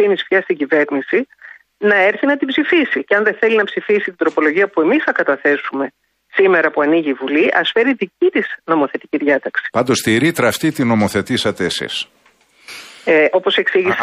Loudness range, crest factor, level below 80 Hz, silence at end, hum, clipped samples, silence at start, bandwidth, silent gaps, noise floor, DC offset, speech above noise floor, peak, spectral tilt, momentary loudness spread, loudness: 2 LU; 14 dB; -58 dBFS; 0 s; none; under 0.1%; 0 s; 15.5 kHz; none; -45 dBFS; under 0.1%; 29 dB; -2 dBFS; -4.5 dB/octave; 7 LU; -15 LUFS